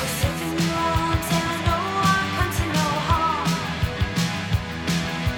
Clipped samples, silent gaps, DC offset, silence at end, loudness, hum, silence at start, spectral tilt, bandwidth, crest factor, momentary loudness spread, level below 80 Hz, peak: under 0.1%; none; under 0.1%; 0 s; -23 LUFS; none; 0 s; -4.5 dB/octave; 19 kHz; 16 dB; 5 LU; -34 dBFS; -6 dBFS